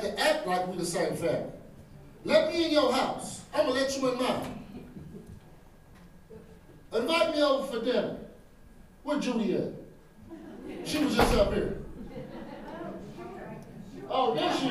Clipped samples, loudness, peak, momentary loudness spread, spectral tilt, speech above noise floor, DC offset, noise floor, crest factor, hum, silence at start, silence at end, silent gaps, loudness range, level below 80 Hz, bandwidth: under 0.1%; -29 LUFS; -8 dBFS; 21 LU; -4.5 dB/octave; 25 dB; under 0.1%; -53 dBFS; 22 dB; none; 0 s; 0 s; none; 6 LU; -48 dBFS; 15.5 kHz